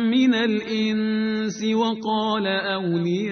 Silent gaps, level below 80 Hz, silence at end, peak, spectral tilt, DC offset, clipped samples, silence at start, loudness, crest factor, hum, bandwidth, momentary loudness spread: none; -64 dBFS; 0 s; -10 dBFS; -5.5 dB/octave; under 0.1%; under 0.1%; 0 s; -22 LUFS; 12 dB; none; 6.6 kHz; 5 LU